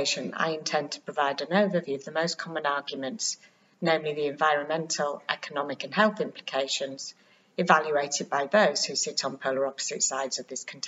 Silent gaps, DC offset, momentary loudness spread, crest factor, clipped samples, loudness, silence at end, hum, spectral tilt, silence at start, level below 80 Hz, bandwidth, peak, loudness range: none; under 0.1%; 10 LU; 24 dB; under 0.1%; -27 LUFS; 0 s; none; -2.5 dB/octave; 0 s; -84 dBFS; 8 kHz; -4 dBFS; 3 LU